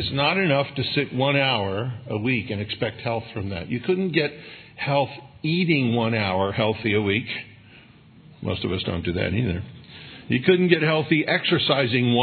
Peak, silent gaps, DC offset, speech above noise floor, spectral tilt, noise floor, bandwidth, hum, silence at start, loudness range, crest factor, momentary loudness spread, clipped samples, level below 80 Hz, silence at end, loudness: -4 dBFS; none; under 0.1%; 27 dB; -9.5 dB/octave; -49 dBFS; 4.6 kHz; none; 0 s; 4 LU; 20 dB; 11 LU; under 0.1%; -56 dBFS; 0 s; -23 LUFS